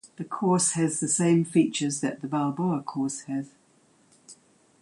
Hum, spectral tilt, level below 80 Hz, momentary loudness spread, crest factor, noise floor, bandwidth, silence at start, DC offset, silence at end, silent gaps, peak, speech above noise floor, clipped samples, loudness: none; -5 dB/octave; -70 dBFS; 11 LU; 18 dB; -62 dBFS; 11.5 kHz; 0.05 s; under 0.1%; 0.5 s; none; -10 dBFS; 36 dB; under 0.1%; -26 LUFS